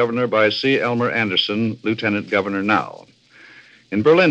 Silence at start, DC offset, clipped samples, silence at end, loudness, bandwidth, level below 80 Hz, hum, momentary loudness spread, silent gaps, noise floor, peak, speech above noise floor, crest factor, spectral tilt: 0 s; under 0.1%; under 0.1%; 0 s; -19 LUFS; 8.2 kHz; -68 dBFS; none; 6 LU; none; -47 dBFS; -2 dBFS; 29 dB; 18 dB; -6.5 dB/octave